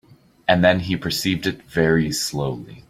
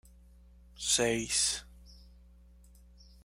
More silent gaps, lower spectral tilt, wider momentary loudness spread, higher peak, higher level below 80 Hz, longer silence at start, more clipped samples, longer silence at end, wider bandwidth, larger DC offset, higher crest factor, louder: neither; first, -5 dB/octave vs -1.5 dB/octave; about the same, 9 LU vs 10 LU; first, -2 dBFS vs -14 dBFS; first, -48 dBFS vs -56 dBFS; second, 0.5 s vs 0.75 s; neither; second, 0.1 s vs 1.25 s; about the same, 16 kHz vs 16 kHz; neither; about the same, 20 dB vs 22 dB; first, -20 LUFS vs -29 LUFS